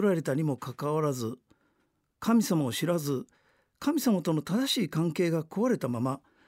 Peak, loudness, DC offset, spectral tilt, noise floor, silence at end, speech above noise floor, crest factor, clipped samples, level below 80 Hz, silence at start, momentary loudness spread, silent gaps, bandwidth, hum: -16 dBFS; -29 LUFS; under 0.1%; -6 dB/octave; -74 dBFS; 0.3 s; 46 dB; 14 dB; under 0.1%; -70 dBFS; 0 s; 7 LU; none; 16 kHz; none